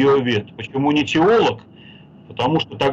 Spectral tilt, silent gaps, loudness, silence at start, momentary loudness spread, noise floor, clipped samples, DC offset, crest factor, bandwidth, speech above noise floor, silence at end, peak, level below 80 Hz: -6 dB/octave; none; -18 LUFS; 0 s; 12 LU; -43 dBFS; under 0.1%; under 0.1%; 10 dB; 7.8 kHz; 26 dB; 0 s; -8 dBFS; -54 dBFS